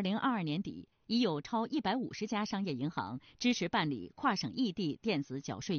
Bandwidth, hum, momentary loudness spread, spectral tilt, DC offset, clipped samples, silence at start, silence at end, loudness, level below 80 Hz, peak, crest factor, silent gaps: 6.8 kHz; none; 8 LU; -4 dB/octave; under 0.1%; under 0.1%; 0 s; 0 s; -35 LUFS; -70 dBFS; -18 dBFS; 18 dB; none